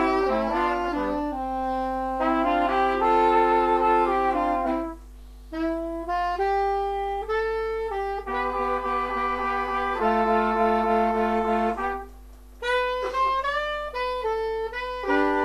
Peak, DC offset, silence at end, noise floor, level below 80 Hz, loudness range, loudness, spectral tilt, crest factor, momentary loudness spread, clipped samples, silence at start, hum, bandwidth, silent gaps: -10 dBFS; under 0.1%; 0 s; -45 dBFS; -44 dBFS; 5 LU; -25 LUFS; -5.5 dB/octave; 16 dB; 8 LU; under 0.1%; 0 s; 50 Hz at -45 dBFS; 14 kHz; none